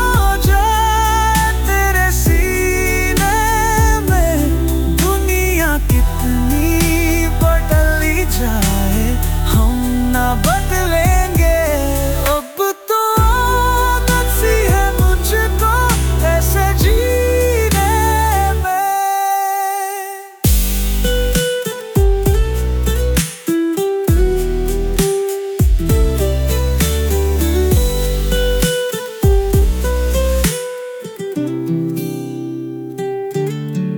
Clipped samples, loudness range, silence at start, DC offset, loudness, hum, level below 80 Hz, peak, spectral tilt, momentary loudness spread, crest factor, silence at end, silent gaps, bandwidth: under 0.1%; 3 LU; 0 s; under 0.1%; -15 LUFS; none; -18 dBFS; -2 dBFS; -5 dB/octave; 6 LU; 12 dB; 0 s; none; 19.5 kHz